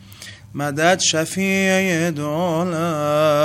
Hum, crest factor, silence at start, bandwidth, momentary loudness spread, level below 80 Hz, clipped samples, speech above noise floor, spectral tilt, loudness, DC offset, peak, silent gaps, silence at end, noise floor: none; 18 dB; 0.05 s; 16 kHz; 11 LU; -56 dBFS; under 0.1%; 21 dB; -4 dB/octave; -19 LUFS; under 0.1%; 0 dBFS; none; 0 s; -39 dBFS